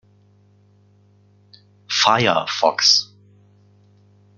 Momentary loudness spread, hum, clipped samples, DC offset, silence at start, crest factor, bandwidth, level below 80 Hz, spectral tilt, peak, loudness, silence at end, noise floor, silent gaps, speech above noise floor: 8 LU; 50 Hz at -50 dBFS; under 0.1%; under 0.1%; 1.9 s; 22 dB; 12 kHz; -66 dBFS; -2 dB/octave; 0 dBFS; -16 LUFS; 1.35 s; -55 dBFS; none; 38 dB